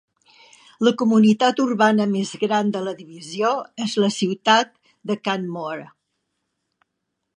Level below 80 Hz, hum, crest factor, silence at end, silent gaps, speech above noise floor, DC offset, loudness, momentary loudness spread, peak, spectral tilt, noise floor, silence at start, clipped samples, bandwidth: -72 dBFS; none; 20 dB; 1.5 s; none; 58 dB; under 0.1%; -20 LUFS; 15 LU; -2 dBFS; -5 dB/octave; -78 dBFS; 0.8 s; under 0.1%; 10 kHz